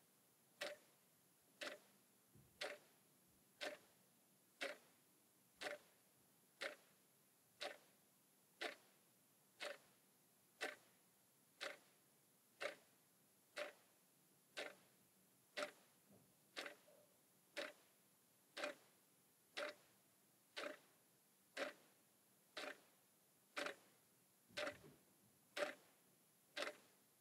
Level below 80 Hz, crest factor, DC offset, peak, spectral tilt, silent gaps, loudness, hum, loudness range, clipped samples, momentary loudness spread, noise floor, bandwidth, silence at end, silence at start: under -90 dBFS; 28 dB; under 0.1%; -30 dBFS; -1.5 dB/octave; none; -53 LUFS; none; 3 LU; under 0.1%; 13 LU; -76 dBFS; 16 kHz; 0.25 s; 0.55 s